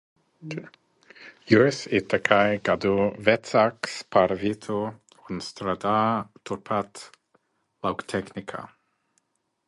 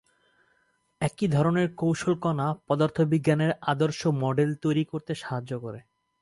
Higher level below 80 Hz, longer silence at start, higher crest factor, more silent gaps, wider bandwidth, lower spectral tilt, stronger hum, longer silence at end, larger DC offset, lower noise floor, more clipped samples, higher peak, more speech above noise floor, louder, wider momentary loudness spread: about the same, -58 dBFS vs -62 dBFS; second, 0.4 s vs 1 s; first, 24 dB vs 18 dB; neither; about the same, 11.5 kHz vs 11.5 kHz; second, -5.5 dB/octave vs -7 dB/octave; neither; first, 1 s vs 0.4 s; neither; about the same, -72 dBFS vs -70 dBFS; neither; first, -2 dBFS vs -10 dBFS; first, 48 dB vs 44 dB; about the same, -24 LUFS vs -26 LUFS; first, 17 LU vs 9 LU